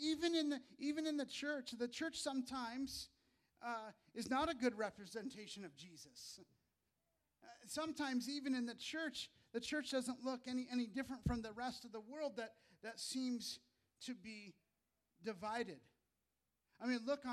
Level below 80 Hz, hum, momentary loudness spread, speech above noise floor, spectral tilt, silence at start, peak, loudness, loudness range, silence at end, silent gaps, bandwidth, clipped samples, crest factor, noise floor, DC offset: -68 dBFS; none; 14 LU; 45 dB; -4 dB/octave; 0 s; -26 dBFS; -45 LUFS; 5 LU; 0 s; none; 14.5 kHz; under 0.1%; 20 dB; -89 dBFS; under 0.1%